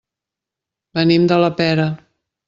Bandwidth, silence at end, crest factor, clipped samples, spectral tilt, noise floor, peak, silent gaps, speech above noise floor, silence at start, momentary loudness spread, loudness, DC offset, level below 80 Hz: 7.4 kHz; 0.5 s; 16 dB; under 0.1%; -7.5 dB/octave; -85 dBFS; -2 dBFS; none; 70 dB; 0.95 s; 12 LU; -16 LUFS; under 0.1%; -58 dBFS